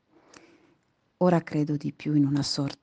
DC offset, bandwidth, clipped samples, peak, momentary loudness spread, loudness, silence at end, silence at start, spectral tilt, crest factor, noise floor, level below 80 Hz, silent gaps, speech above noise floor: under 0.1%; 9.4 kHz; under 0.1%; -8 dBFS; 5 LU; -26 LUFS; 0.1 s; 1.2 s; -6.5 dB/octave; 18 dB; -69 dBFS; -66 dBFS; none; 43 dB